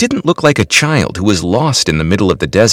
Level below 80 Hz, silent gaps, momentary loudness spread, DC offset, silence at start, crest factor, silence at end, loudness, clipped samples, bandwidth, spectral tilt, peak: -34 dBFS; none; 3 LU; 0.1%; 0 s; 12 dB; 0 s; -12 LUFS; 0.4%; 18 kHz; -4.5 dB/octave; 0 dBFS